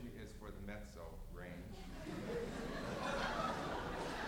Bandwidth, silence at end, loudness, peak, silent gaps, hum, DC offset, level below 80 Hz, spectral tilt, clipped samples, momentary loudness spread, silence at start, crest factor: over 20 kHz; 0 s; -45 LUFS; -28 dBFS; none; none; under 0.1%; -54 dBFS; -5 dB/octave; under 0.1%; 12 LU; 0 s; 18 dB